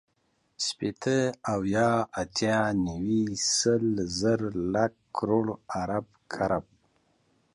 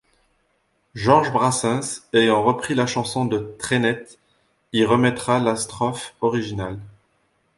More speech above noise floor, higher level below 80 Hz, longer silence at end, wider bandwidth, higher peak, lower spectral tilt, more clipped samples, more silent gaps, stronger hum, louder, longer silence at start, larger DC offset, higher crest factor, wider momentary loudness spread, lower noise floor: about the same, 45 dB vs 47 dB; about the same, -56 dBFS vs -54 dBFS; first, 0.95 s vs 0.65 s; about the same, 11.5 kHz vs 11.5 kHz; second, -12 dBFS vs -2 dBFS; about the same, -4.5 dB/octave vs -4.5 dB/octave; neither; neither; neither; second, -28 LUFS vs -21 LUFS; second, 0.6 s vs 0.95 s; neither; about the same, 16 dB vs 20 dB; about the same, 8 LU vs 10 LU; first, -72 dBFS vs -67 dBFS